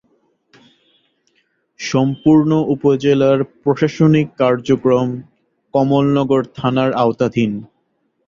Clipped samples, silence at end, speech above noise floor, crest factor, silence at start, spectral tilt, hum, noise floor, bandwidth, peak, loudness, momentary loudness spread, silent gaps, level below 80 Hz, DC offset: under 0.1%; 0.6 s; 51 dB; 14 dB; 1.8 s; -7.5 dB/octave; none; -66 dBFS; 7.4 kHz; -2 dBFS; -16 LUFS; 7 LU; none; -52 dBFS; under 0.1%